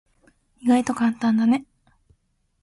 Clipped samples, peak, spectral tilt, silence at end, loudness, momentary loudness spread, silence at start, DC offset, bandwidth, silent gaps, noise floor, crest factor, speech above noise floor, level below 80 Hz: under 0.1%; -8 dBFS; -5.5 dB/octave; 1 s; -21 LUFS; 5 LU; 0.65 s; under 0.1%; 11.5 kHz; none; -68 dBFS; 16 dB; 48 dB; -62 dBFS